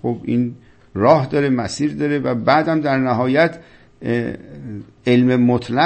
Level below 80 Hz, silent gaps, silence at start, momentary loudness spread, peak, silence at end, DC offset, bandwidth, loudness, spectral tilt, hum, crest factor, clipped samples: -52 dBFS; none; 0 s; 15 LU; 0 dBFS; 0 s; under 0.1%; 8.6 kHz; -18 LUFS; -7 dB/octave; none; 18 dB; under 0.1%